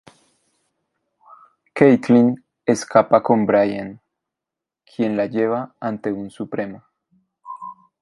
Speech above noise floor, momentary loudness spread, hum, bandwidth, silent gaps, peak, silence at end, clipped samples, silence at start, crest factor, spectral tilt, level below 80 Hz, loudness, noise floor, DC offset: 69 dB; 20 LU; none; 11.5 kHz; none; 0 dBFS; 0.3 s; under 0.1%; 1.75 s; 20 dB; -7 dB/octave; -62 dBFS; -19 LUFS; -86 dBFS; under 0.1%